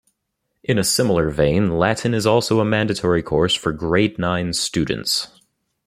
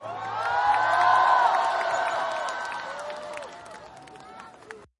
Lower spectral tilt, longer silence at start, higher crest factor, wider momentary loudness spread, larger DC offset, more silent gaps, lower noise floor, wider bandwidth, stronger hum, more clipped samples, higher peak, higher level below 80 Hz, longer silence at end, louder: first, -4.5 dB/octave vs -2 dB/octave; first, 0.7 s vs 0 s; about the same, 18 dB vs 18 dB; second, 5 LU vs 25 LU; neither; neither; first, -75 dBFS vs -47 dBFS; first, 15.5 kHz vs 11.5 kHz; neither; neither; first, -2 dBFS vs -8 dBFS; first, -44 dBFS vs -66 dBFS; first, 0.6 s vs 0.15 s; first, -19 LUFS vs -24 LUFS